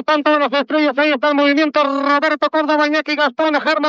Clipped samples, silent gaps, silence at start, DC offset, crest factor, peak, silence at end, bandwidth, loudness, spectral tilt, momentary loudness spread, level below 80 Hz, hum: under 0.1%; none; 0 s; under 0.1%; 12 dB; -2 dBFS; 0 s; 7.4 kHz; -15 LUFS; -3.5 dB/octave; 3 LU; -76 dBFS; none